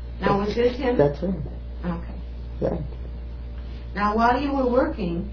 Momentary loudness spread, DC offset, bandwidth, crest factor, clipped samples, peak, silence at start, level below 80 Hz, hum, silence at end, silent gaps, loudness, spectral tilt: 15 LU; under 0.1%; 5.4 kHz; 18 dB; under 0.1%; -6 dBFS; 0 s; -34 dBFS; none; 0 s; none; -24 LUFS; -8 dB/octave